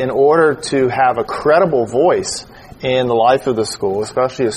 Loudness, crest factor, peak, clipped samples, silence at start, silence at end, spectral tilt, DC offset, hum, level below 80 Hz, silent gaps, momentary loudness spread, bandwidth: -15 LUFS; 14 dB; 0 dBFS; under 0.1%; 0 s; 0 s; -5 dB/octave; under 0.1%; none; -48 dBFS; none; 6 LU; 12 kHz